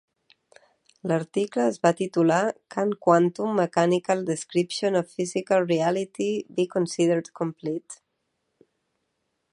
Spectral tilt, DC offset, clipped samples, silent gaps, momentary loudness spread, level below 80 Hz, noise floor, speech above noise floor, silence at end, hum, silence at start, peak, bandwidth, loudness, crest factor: -5.5 dB/octave; under 0.1%; under 0.1%; none; 9 LU; -76 dBFS; -77 dBFS; 53 dB; 1.6 s; none; 1.05 s; -4 dBFS; 11.5 kHz; -25 LUFS; 20 dB